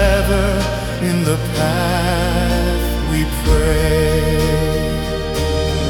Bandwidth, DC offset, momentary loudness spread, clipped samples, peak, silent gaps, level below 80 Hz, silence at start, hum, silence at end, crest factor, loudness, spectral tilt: 18 kHz; under 0.1%; 5 LU; under 0.1%; -2 dBFS; none; -22 dBFS; 0 s; none; 0 s; 14 dB; -17 LUFS; -5.5 dB/octave